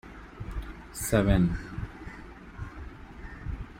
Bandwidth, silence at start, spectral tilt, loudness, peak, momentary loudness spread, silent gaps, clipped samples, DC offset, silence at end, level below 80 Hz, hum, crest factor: 16.5 kHz; 0.05 s; -6 dB/octave; -30 LUFS; -12 dBFS; 21 LU; none; under 0.1%; under 0.1%; 0 s; -40 dBFS; none; 20 dB